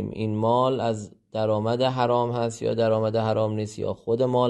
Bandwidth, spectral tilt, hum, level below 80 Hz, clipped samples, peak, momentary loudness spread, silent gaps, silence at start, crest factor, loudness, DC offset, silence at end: 11 kHz; -7 dB/octave; none; -60 dBFS; under 0.1%; -8 dBFS; 7 LU; none; 0 s; 16 dB; -25 LUFS; under 0.1%; 0 s